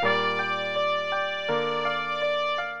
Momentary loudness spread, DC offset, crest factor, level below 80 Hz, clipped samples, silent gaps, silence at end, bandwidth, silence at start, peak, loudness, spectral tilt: 3 LU; 0.5%; 16 dB; -68 dBFS; under 0.1%; none; 0 s; 8.8 kHz; 0 s; -10 dBFS; -26 LUFS; -4 dB/octave